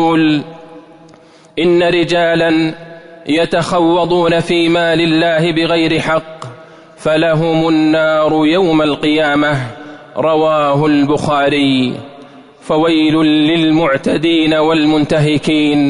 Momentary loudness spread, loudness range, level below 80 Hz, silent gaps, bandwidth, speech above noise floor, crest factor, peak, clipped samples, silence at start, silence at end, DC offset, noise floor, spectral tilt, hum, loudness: 8 LU; 2 LU; -46 dBFS; none; 11 kHz; 30 dB; 10 dB; -4 dBFS; under 0.1%; 0 s; 0 s; under 0.1%; -42 dBFS; -6 dB/octave; none; -12 LUFS